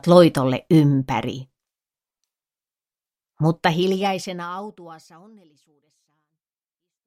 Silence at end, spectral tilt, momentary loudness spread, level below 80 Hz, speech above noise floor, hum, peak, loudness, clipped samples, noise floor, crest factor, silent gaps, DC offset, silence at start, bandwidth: 2.1 s; -7 dB/octave; 17 LU; -58 dBFS; over 70 dB; none; 0 dBFS; -20 LUFS; under 0.1%; under -90 dBFS; 22 dB; none; under 0.1%; 0.05 s; 15 kHz